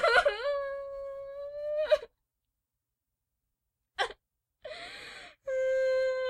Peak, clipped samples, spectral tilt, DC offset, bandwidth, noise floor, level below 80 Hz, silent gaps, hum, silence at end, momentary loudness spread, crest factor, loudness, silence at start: -12 dBFS; under 0.1%; -1.5 dB/octave; under 0.1%; 11 kHz; -87 dBFS; -64 dBFS; none; none; 0 s; 16 LU; 22 dB; -32 LUFS; 0 s